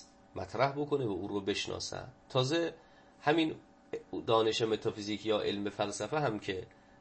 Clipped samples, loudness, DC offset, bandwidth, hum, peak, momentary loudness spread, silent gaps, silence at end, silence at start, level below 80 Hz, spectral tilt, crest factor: under 0.1%; -34 LUFS; under 0.1%; 8.8 kHz; none; -14 dBFS; 14 LU; none; 0.35 s; 0 s; -66 dBFS; -5 dB/octave; 20 dB